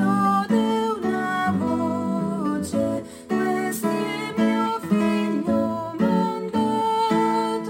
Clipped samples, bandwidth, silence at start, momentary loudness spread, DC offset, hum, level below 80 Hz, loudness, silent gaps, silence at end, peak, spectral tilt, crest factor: under 0.1%; 16.5 kHz; 0 s; 5 LU; under 0.1%; none; -60 dBFS; -23 LUFS; none; 0 s; -8 dBFS; -6 dB/octave; 14 dB